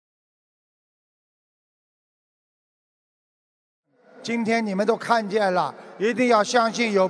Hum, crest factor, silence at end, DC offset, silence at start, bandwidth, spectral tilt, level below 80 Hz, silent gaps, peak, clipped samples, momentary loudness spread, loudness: none; 22 dB; 0 s; under 0.1%; 4.15 s; 11 kHz; -4.5 dB/octave; -84 dBFS; none; -4 dBFS; under 0.1%; 9 LU; -22 LUFS